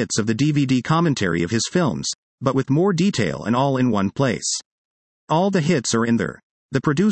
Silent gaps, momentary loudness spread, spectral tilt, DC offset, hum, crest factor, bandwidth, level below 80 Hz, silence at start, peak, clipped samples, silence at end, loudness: 2.15-2.38 s, 4.65-5.27 s, 6.43-6.69 s; 6 LU; -5 dB/octave; under 0.1%; none; 16 dB; 8.8 kHz; -56 dBFS; 0 s; -4 dBFS; under 0.1%; 0 s; -20 LUFS